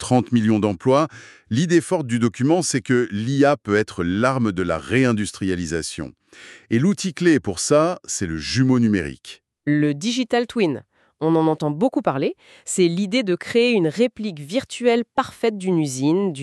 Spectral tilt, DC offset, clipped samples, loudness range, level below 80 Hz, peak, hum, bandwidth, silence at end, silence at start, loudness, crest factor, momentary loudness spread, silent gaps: -5.5 dB/octave; under 0.1%; under 0.1%; 2 LU; -54 dBFS; -4 dBFS; none; 12.5 kHz; 0 s; 0 s; -20 LUFS; 16 dB; 8 LU; none